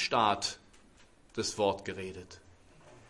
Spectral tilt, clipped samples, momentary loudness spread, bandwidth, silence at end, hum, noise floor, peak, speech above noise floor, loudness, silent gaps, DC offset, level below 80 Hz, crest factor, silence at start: -3 dB/octave; under 0.1%; 21 LU; 11.5 kHz; 0.1 s; none; -61 dBFS; -12 dBFS; 29 dB; -33 LUFS; none; under 0.1%; -66 dBFS; 22 dB; 0 s